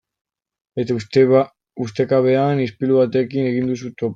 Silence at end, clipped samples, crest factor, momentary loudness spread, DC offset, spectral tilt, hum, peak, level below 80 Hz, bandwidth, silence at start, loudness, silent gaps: 0 s; under 0.1%; 16 dB; 12 LU; under 0.1%; -8 dB/octave; none; -2 dBFS; -60 dBFS; 7.6 kHz; 0.75 s; -18 LUFS; none